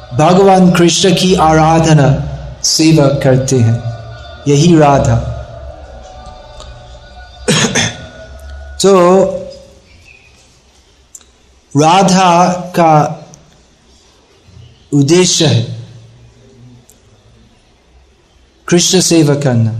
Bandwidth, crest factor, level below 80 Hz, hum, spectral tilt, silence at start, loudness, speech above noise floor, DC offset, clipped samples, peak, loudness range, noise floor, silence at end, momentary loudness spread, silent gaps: 13 kHz; 12 dB; -34 dBFS; none; -5 dB/octave; 0 s; -9 LUFS; 39 dB; under 0.1%; under 0.1%; 0 dBFS; 7 LU; -48 dBFS; 0 s; 22 LU; none